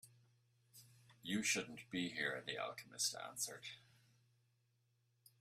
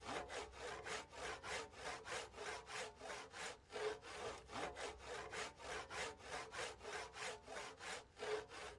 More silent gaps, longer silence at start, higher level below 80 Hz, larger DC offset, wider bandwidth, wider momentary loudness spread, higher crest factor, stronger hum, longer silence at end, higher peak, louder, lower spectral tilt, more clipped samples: neither; about the same, 0.05 s vs 0 s; second, -84 dBFS vs -70 dBFS; neither; first, 15.5 kHz vs 11.5 kHz; first, 16 LU vs 4 LU; about the same, 22 dB vs 18 dB; neither; first, 1.6 s vs 0 s; first, -26 dBFS vs -32 dBFS; first, -42 LUFS vs -49 LUFS; about the same, -2 dB/octave vs -2 dB/octave; neither